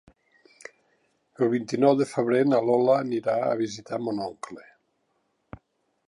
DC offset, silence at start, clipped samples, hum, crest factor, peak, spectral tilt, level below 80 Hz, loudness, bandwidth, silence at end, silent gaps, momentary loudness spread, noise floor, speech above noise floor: under 0.1%; 1.4 s; under 0.1%; none; 20 dB; -8 dBFS; -6.5 dB/octave; -66 dBFS; -24 LUFS; 11.5 kHz; 1.45 s; none; 19 LU; -73 dBFS; 49 dB